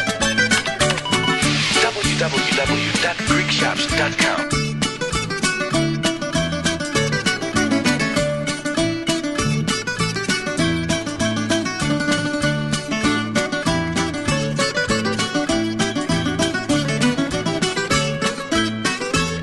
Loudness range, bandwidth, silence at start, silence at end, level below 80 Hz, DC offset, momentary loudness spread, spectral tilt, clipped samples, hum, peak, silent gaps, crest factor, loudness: 3 LU; 12 kHz; 0 s; 0 s; -40 dBFS; 0.2%; 5 LU; -3.5 dB/octave; under 0.1%; none; -4 dBFS; none; 16 dB; -19 LUFS